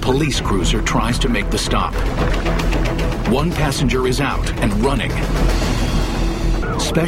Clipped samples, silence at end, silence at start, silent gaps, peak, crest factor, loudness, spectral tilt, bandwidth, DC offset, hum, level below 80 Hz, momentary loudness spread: under 0.1%; 0 s; 0 s; none; -2 dBFS; 16 dB; -19 LUFS; -5 dB/octave; 15.5 kHz; under 0.1%; none; -20 dBFS; 3 LU